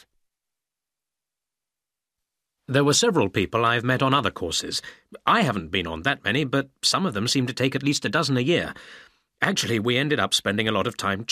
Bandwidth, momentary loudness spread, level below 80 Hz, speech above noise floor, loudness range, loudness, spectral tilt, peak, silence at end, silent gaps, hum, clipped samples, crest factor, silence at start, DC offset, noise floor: 15.5 kHz; 6 LU; -56 dBFS; 65 dB; 2 LU; -23 LUFS; -4 dB/octave; -4 dBFS; 0 s; none; none; under 0.1%; 22 dB; 2.7 s; under 0.1%; -88 dBFS